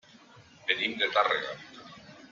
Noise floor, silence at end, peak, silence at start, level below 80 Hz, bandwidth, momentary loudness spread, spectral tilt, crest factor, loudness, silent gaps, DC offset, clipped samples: -55 dBFS; 0.05 s; -10 dBFS; 0.35 s; -76 dBFS; 7.6 kHz; 22 LU; -3 dB/octave; 24 dB; -28 LUFS; none; under 0.1%; under 0.1%